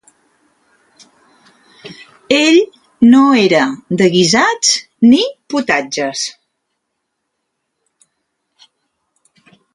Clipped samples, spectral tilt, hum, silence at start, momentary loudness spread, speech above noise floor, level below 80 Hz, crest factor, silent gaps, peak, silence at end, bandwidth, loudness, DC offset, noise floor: under 0.1%; -3.5 dB/octave; none; 1.85 s; 12 LU; 61 dB; -58 dBFS; 16 dB; none; 0 dBFS; 3.45 s; 11.5 kHz; -12 LUFS; under 0.1%; -72 dBFS